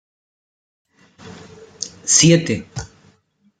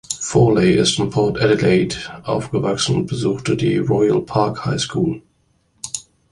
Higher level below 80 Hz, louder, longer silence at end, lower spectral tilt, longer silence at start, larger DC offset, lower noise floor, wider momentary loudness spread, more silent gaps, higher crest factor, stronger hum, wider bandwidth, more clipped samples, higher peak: second, -52 dBFS vs -44 dBFS; first, -15 LUFS vs -18 LUFS; first, 0.75 s vs 0.3 s; second, -3.5 dB/octave vs -5 dB/octave; first, 1.25 s vs 0.1 s; neither; about the same, -60 dBFS vs -62 dBFS; first, 26 LU vs 13 LU; neither; about the same, 20 dB vs 16 dB; neither; second, 10 kHz vs 11.5 kHz; neither; about the same, 0 dBFS vs -2 dBFS